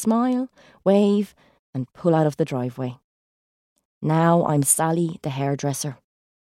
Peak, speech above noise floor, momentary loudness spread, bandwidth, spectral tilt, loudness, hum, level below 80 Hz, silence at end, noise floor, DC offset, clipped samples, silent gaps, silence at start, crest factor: -4 dBFS; over 69 dB; 14 LU; 15.5 kHz; -5.5 dB/octave; -22 LUFS; none; -64 dBFS; 0.55 s; under -90 dBFS; under 0.1%; under 0.1%; 1.59-1.73 s, 3.04-3.76 s, 3.85-4.01 s; 0 s; 18 dB